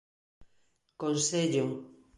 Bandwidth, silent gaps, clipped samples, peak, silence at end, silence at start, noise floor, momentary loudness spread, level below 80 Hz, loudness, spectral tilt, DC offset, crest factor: 11.5 kHz; none; under 0.1%; -16 dBFS; 0.3 s; 0.4 s; -72 dBFS; 9 LU; -70 dBFS; -30 LUFS; -4 dB/octave; under 0.1%; 16 dB